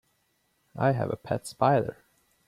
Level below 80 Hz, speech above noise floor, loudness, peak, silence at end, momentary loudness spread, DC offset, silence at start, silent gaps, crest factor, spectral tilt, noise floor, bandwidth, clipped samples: -62 dBFS; 46 dB; -28 LUFS; -8 dBFS; 0.55 s; 11 LU; under 0.1%; 0.75 s; none; 22 dB; -7 dB/octave; -72 dBFS; 14.5 kHz; under 0.1%